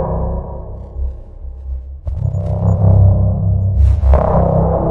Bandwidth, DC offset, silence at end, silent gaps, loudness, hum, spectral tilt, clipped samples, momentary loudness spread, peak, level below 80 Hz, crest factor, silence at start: 2.6 kHz; under 0.1%; 0 s; none; -14 LUFS; none; -11.5 dB/octave; under 0.1%; 18 LU; 0 dBFS; -18 dBFS; 12 dB; 0 s